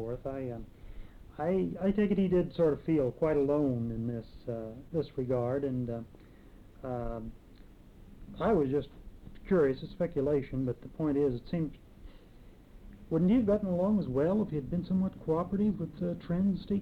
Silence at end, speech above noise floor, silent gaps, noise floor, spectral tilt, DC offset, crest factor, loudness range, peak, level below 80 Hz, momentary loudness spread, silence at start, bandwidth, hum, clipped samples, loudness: 0 s; 23 dB; none; -54 dBFS; -10 dB/octave; under 0.1%; 14 dB; 6 LU; -18 dBFS; -50 dBFS; 13 LU; 0 s; 5.8 kHz; none; under 0.1%; -32 LUFS